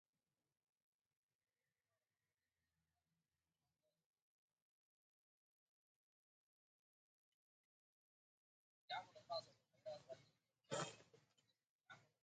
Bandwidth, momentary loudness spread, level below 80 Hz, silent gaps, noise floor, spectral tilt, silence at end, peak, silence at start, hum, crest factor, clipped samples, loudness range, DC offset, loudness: 8.4 kHz; 18 LU; under -90 dBFS; 11.69-11.79 s; under -90 dBFS; -3 dB/octave; 0.2 s; -34 dBFS; 8.9 s; none; 28 dB; under 0.1%; 6 LU; under 0.1%; -53 LUFS